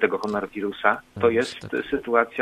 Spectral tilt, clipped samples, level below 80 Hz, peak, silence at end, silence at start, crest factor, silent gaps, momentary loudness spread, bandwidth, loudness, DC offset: -5.5 dB/octave; under 0.1%; -58 dBFS; -2 dBFS; 0 s; 0 s; 22 dB; none; 6 LU; 11.5 kHz; -24 LUFS; under 0.1%